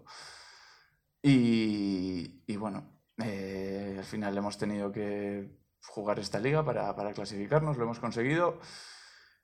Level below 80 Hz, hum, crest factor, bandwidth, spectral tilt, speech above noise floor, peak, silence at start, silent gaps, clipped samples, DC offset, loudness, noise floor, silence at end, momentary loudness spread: -64 dBFS; none; 20 dB; 12.5 kHz; -6.5 dB/octave; 35 dB; -12 dBFS; 0.05 s; none; under 0.1%; under 0.1%; -32 LUFS; -67 dBFS; 0.35 s; 19 LU